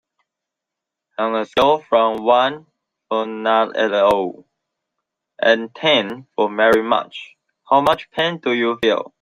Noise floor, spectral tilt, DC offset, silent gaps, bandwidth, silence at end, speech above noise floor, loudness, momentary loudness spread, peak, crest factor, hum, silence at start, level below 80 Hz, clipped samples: -84 dBFS; -4.5 dB/octave; under 0.1%; none; 15.5 kHz; 0.15 s; 66 dB; -18 LUFS; 9 LU; -2 dBFS; 18 dB; none; 1.2 s; -58 dBFS; under 0.1%